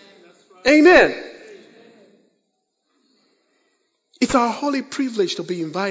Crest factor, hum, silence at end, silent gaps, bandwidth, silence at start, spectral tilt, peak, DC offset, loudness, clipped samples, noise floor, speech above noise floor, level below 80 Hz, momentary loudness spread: 20 dB; none; 0 s; none; 8 kHz; 0.65 s; -4 dB/octave; -2 dBFS; under 0.1%; -17 LUFS; under 0.1%; -73 dBFS; 56 dB; -54 dBFS; 15 LU